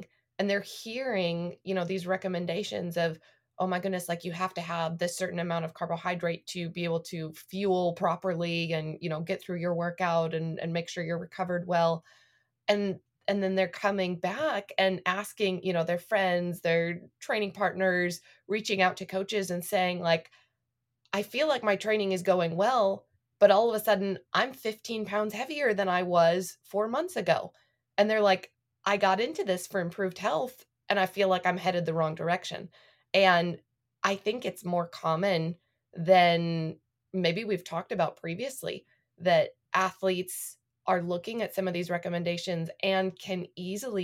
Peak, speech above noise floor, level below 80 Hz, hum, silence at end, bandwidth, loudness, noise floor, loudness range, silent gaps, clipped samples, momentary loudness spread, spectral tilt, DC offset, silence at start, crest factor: -8 dBFS; 54 dB; -76 dBFS; none; 0 s; 16.5 kHz; -29 LUFS; -83 dBFS; 5 LU; none; under 0.1%; 10 LU; -5 dB/octave; under 0.1%; 0 s; 22 dB